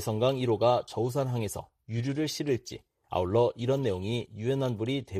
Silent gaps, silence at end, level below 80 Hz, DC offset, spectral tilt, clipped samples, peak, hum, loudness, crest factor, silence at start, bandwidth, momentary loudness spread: none; 0 s; -60 dBFS; under 0.1%; -6.5 dB/octave; under 0.1%; -12 dBFS; none; -30 LUFS; 18 dB; 0 s; 15 kHz; 9 LU